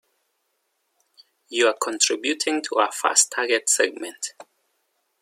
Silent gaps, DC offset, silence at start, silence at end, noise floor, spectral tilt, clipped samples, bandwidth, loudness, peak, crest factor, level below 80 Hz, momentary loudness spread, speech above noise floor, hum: none; under 0.1%; 1.5 s; 0.8 s; -73 dBFS; 1 dB/octave; under 0.1%; 16.5 kHz; -21 LUFS; -2 dBFS; 22 dB; -82 dBFS; 13 LU; 51 dB; none